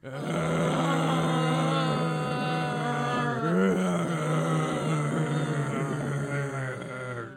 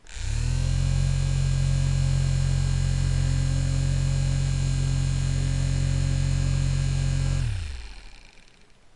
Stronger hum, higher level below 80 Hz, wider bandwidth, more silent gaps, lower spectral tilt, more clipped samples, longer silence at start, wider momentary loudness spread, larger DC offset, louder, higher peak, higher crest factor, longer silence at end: neither; second, -62 dBFS vs -30 dBFS; first, 13 kHz vs 11 kHz; neither; about the same, -6 dB/octave vs -5.5 dB/octave; neither; about the same, 0.05 s vs 0.05 s; about the same, 6 LU vs 4 LU; neither; second, -28 LUFS vs -25 LUFS; about the same, -14 dBFS vs -12 dBFS; about the same, 14 dB vs 12 dB; second, 0 s vs 0.75 s